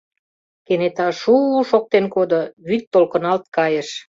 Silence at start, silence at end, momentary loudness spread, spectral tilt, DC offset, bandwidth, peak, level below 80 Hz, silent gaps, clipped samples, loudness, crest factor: 0.7 s; 0.15 s; 7 LU; -6 dB/octave; under 0.1%; 7.8 kHz; -2 dBFS; -64 dBFS; 2.53-2.57 s, 2.87-2.91 s; under 0.1%; -18 LUFS; 16 dB